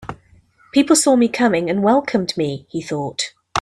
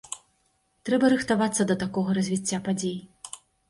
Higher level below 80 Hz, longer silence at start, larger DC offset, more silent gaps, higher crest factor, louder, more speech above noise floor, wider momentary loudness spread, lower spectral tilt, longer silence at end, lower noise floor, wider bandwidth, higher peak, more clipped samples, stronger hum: first, -56 dBFS vs -62 dBFS; about the same, 0 s vs 0.1 s; neither; neither; about the same, 18 dB vs 18 dB; first, -18 LUFS vs -25 LUFS; second, 35 dB vs 45 dB; second, 12 LU vs 18 LU; about the same, -4 dB/octave vs -5 dB/octave; second, 0 s vs 0.35 s; second, -52 dBFS vs -70 dBFS; first, 14.5 kHz vs 11.5 kHz; first, 0 dBFS vs -10 dBFS; neither; neither